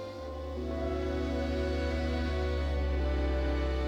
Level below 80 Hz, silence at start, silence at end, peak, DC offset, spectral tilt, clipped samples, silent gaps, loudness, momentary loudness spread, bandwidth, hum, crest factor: -34 dBFS; 0 s; 0 s; -20 dBFS; under 0.1%; -7.5 dB/octave; under 0.1%; none; -33 LUFS; 6 LU; 8 kHz; none; 10 dB